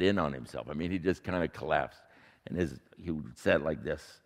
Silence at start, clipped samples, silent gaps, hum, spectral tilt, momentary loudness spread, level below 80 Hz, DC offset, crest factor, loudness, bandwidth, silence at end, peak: 0 s; under 0.1%; none; none; -6.5 dB/octave; 11 LU; -56 dBFS; under 0.1%; 22 dB; -33 LUFS; 15 kHz; 0.1 s; -10 dBFS